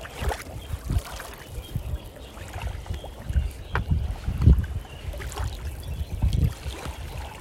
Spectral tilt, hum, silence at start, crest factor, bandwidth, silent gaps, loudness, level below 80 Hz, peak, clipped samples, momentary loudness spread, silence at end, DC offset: -6 dB/octave; none; 0 s; 24 dB; 16 kHz; none; -30 LUFS; -30 dBFS; -4 dBFS; under 0.1%; 14 LU; 0 s; under 0.1%